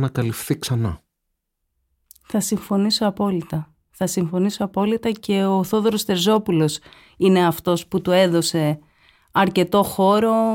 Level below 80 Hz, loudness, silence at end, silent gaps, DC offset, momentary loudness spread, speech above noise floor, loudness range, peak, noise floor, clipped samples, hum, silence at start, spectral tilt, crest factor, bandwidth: -52 dBFS; -20 LUFS; 0 s; none; under 0.1%; 9 LU; 57 dB; 5 LU; -4 dBFS; -77 dBFS; under 0.1%; none; 0 s; -5.5 dB/octave; 16 dB; 17 kHz